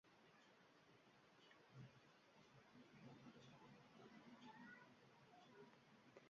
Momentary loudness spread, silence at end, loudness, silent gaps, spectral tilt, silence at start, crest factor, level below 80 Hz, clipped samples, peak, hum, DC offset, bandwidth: 6 LU; 0 s; -66 LUFS; none; -4 dB/octave; 0.05 s; 18 dB; under -90 dBFS; under 0.1%; -50 dBFS; none; under 0.1%; 7.2 kHz